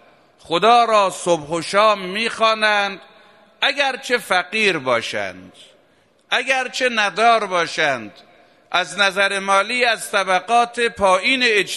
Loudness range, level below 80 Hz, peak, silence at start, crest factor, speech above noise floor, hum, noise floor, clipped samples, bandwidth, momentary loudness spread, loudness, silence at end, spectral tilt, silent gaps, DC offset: 3 LU; -58 dBFS; 0 dBFS; 0.5 s; 18 dB; 39 dB; none; -57 dBFS; under 0.1%; 14 kHz; 7 LU; -17 LUFS; 0 s; -2.5 dB/octave; none; under 0.1%